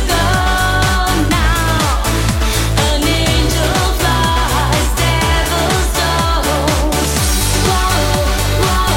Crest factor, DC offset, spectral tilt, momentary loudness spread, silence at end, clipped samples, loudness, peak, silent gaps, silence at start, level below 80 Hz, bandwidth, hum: 12 dB; under 0.1%; -4 dB/octave; 2 LU; 0 s; under 0.1%; -14 LUFS; 0 dBFS; none; 0 s; -18 dBFS; 17 kHz; none